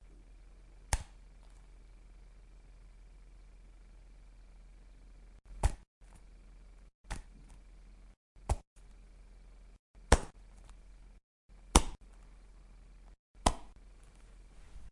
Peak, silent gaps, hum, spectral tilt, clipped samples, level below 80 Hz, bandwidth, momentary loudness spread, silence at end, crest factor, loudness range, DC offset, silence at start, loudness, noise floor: 0 dBFS; 5.87-6.01 s, 6.94-7.04 s, 8.17-8.35 s, 8.67-8.76 s, 9.79-9.94 s, 11.23-11.49 s, 13.19-13.34 s; none; -4 dB/octave; under 0.1%; -44 dBFS; 11.5 kHz; 29 LU; 0 s; 40 dB; 24 LU; under 0.1%; 0.8 s; -35 LUFS; -56 dBFS